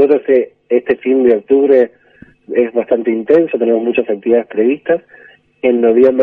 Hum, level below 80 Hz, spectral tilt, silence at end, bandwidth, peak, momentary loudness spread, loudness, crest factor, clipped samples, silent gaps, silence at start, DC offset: none; -58 dBFS; -8.5 dB/octave; 0 s; 4 kHz; 0 dBFS; 7 LU; -13 LUFS; 12 dB; under 0.1%; none; 0 s; under 0.1%